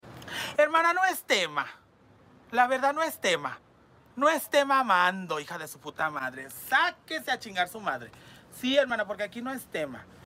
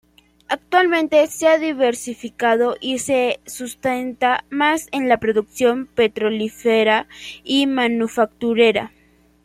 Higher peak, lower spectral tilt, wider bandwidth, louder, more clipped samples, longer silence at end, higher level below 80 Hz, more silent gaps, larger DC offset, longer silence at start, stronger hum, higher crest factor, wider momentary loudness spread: second, -10 dBFS vs -2 dBFS; about the same, -2.5 dB/octave vs -3.5 dB/octave; about the same, 16 kHz vs 16 kHz; second, -27 LUFS vs -19 LUFS; neither; second, 0.2 s vs 0.6 s; second, -70 dBFS vs -58 dBFS; neither; neither; second, 0.05 s vs 0.5 s; neither; about the same, 18 dB vs 18 dB; first, 15 LU vs 10 LU